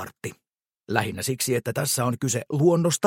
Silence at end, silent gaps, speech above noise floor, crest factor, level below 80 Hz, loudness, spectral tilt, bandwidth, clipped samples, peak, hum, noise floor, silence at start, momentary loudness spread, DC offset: 0 s; none; 32 dB; 22 dB; -64 dBFS; -24 LUFS; -4.5 dB/octave; 16.5 kHz; under 0.1%; -4 dBFS; none; -56 dBFS; 0 s; 13 LU; under 0.1%